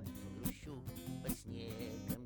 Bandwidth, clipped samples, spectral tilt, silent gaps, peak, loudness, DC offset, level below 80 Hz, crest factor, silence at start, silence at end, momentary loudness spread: over 20 kHz; under 0.1%; -5.5 dB/octave; none; -24 dBFS; -45 LUFS; under 0.1%; -56 dBFS; 20 dB; 0 s; 0 s; 5 LU